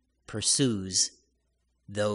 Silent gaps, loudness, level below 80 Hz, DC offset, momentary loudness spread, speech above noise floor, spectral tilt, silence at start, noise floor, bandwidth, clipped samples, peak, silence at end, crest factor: none; -26 LUFS; -64 dBFS; under 0.1%; 14 LU; 47 dB; -3 dB/octave; 0.3 s; -74 dBFS; 11 kHz; under 0.1%; -12 dBFS; 0 s; 18 dB